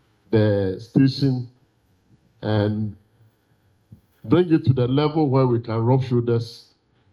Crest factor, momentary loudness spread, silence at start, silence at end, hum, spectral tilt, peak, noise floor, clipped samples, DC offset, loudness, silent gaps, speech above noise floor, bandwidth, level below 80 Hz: 18 dB; 11 LU; 0.3 s; 0.55 s; none; -9 dB/octave; -4 dBFS; -62 dBFS; under 0.1%; under 0.1%; -21 LUFS; none; 42 dB; 6.8 kHz; -56 dBFS